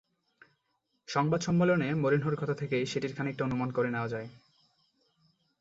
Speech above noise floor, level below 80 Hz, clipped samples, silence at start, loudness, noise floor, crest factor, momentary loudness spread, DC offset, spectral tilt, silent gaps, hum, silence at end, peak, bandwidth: 49 dB; -66 dBFS; under 0.1%; 1.1 s; -30 LUFS; -78 dBFS; 20 dB; 8 LU; under 0.1%; -6.5 dB/octave; none; none; 1.25 s; -12 dBFS; 7.8 kHz